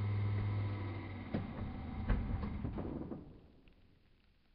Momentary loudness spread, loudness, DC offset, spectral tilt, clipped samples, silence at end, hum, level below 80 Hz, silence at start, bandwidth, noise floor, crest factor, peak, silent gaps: 10 LU; -41 LUFS; under 0.1%; -8 dB/octave; under 0.1%; 0.85 s; none; -46 dBFS; 0 s; 5.2 kHz; -68 dBFS; 20 dB; -22 dBFS; none